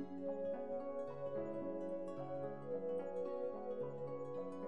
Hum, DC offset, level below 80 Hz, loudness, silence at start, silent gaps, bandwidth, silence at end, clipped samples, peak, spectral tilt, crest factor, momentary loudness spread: none; 0.2%; -78 dBFS; -45 LUFS; 0 s; none; 9 kHz; 0 s; under 0.1%; -32 dBFS; -9 dB/octave; 12 dB; 3 LU